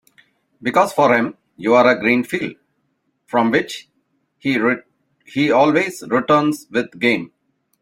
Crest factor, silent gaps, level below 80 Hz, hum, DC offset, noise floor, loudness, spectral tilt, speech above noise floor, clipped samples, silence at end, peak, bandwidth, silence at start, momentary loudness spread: 18 dB; none; -62 dBFS; none; under 0.1%; -68 dBFS; -17 LUFS; -5.5 dB/octave; 52 dB; under 0.1%; 0.55 s; 0 dBFS; 16.5 kHz; 0.6 s; 12 LU